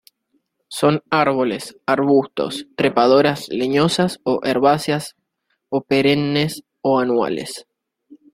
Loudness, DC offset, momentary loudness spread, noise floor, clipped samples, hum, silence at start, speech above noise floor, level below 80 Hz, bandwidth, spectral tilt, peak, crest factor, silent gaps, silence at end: -18 LUFS; under 0.1%; 10 LU; -71 dBFS; under 0.1%; none; 0.7 s; 54 dB; -58 dBFS; 16 kHz; -5.5 dB/octave; -2 dBFS; 18 dB; none; 0.2 s